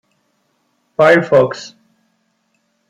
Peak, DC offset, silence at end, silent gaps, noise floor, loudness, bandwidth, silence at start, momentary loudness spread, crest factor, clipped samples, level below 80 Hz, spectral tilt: -2 dBFS; under 0.1%; 1.25 s; none; -64 dBFS; -12 LUFS; 10.5 kHz; 1 s; 19 LU; 16 dB; under 0.1%; -60 dBFS; -6 dB/octave